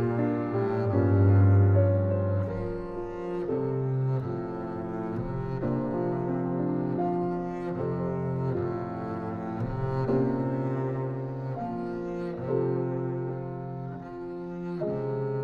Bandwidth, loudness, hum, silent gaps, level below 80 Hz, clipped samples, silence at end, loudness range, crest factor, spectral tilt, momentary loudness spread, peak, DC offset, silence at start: 4.7 kHz; -29 LUFS; none; none; -50 dBFS; under 0.1%; 0 s; 7 LU; 16 dB; -11 dB/octave; 11 LU; -10 dBFS; under 0.1%; 0 s